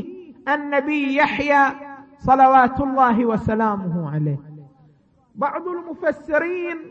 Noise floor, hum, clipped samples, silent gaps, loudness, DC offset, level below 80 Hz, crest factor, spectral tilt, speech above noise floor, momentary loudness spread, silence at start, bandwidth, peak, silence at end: -56 dBFS; none; under 0.1%; none; -19 LUFS; under 0.1%; -48 dBFS; 16 dB; -7.5 dB/octave; 37 dB; 14 LU; 0 s; 7.4 kHz; -4 dBFS; 0 s